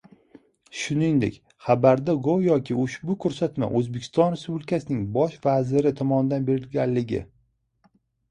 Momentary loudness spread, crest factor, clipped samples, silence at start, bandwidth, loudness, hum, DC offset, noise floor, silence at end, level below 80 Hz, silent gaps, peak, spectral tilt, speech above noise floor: 8 LU; 20 dB; under 0.1%; 0.75 s; 10.5 kHz; -24 LUFS; none; under 0.1%; -67 dBFS; 1.05 s; -56 dBFS; none; -4 dBFS; -7.5 dB/octave; 44 dB